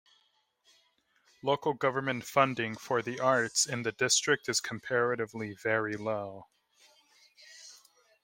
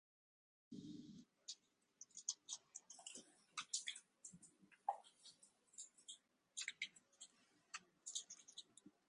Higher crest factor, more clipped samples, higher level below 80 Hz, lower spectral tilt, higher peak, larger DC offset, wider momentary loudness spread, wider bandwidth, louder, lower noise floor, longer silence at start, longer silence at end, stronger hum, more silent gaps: second, 24 dB vs 30 dB; neither; first, -76 dBFS vs under -90 dBFS; first, -2.5 dB/octave vs 0 dB/octave; first, -10 dBFS vs -26 dBFS; neither; about the same, 13 LU vs 15 LU; first, 16.5 kHz vs 11 kHz; first, -30 LUFS vs -53 LUFS; about the same, -73 dBFS vs -73 dBFS; first, 1.45 s vs 0.7 s; first, 0.5 s vs 0.2 s; neither; neither